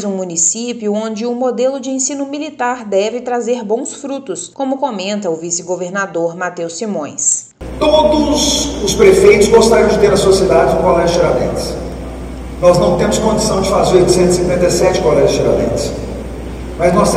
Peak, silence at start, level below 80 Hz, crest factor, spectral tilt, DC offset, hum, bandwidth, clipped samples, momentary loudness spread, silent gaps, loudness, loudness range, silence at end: 0 dBFS; 0 s; -30 dBFS; 14 dB; -4 dB/octave; under 0.1%; none; 15 kHz; 0.3%; 12 LU; none; -13 LUFS; 8 LU; 0 s